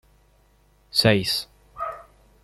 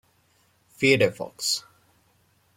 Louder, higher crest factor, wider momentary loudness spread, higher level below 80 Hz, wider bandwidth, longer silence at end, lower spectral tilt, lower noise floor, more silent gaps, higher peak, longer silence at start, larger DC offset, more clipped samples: about the same, -23 LUFS vs -23 LUFS; about the same, 24 dB vs 22 dB; first, 20 LU vs 9 LU; first, -54 dBFS vs -66 dBFS; second, 14.5 kHz vs 16.5 kHz; second, 0.4 s vs 0.95 s; about the same, -4.5 dB/octave vs -3.5 dB/octave; second, -59 dBFS vs -65 dBFS; neither; about the same, -4 dBFS vs -6 dBFS; first, 0.95 s vs 0.8 s; neither; neither